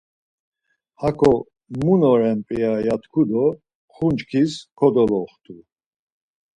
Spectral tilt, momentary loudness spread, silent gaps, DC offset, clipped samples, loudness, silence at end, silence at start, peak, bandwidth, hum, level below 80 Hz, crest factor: -8 dB/octave; 9 LU; 3.75-3.88 s; under 0.1%; under 0.1%; -20 LUFS; 1 s; 1 s; -4 dBFS; 10.5 kHz; none; -50 dBFS; 18 dB